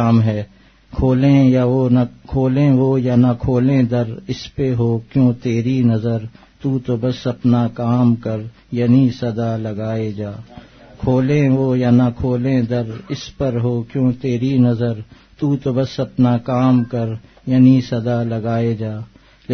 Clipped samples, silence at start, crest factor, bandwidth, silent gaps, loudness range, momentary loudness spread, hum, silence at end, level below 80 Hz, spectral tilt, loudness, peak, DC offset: under 0.1%; 0 s; 14 dB; 6.4 kHz; none; 4 LU; 12 LU; none; 0 s; -42 dBFS; -9 dB/octave; -17 LUFS; -2 dBFS; under 0.1%